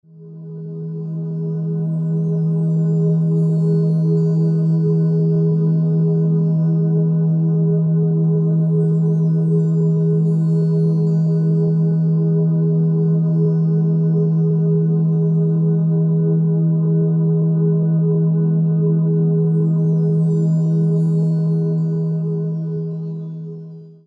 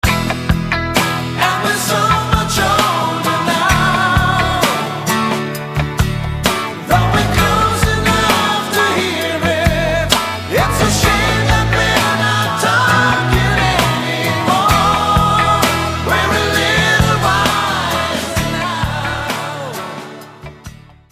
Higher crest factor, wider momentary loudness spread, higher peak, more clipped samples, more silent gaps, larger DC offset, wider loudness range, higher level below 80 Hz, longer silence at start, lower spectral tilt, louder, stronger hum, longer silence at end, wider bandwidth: second, 8 dB vs 14 dB; about the same, 7 LU vs 7 LU; second, -8 dBFS vs 0 dBFS; neither; neither; neither; about the same, 2 LU vs 3 LU; second, -64 dBFS vs -28 dBFS; about the same, 0.15 s vs 0.05 s; first, -12.5 dB/octave vs -4 dB/octave; second, -17 LUFS vs -14 LUFS; neither; second, 0.15 s vs 0.4 s; second, 1.6 kHz vs 15.5 kHz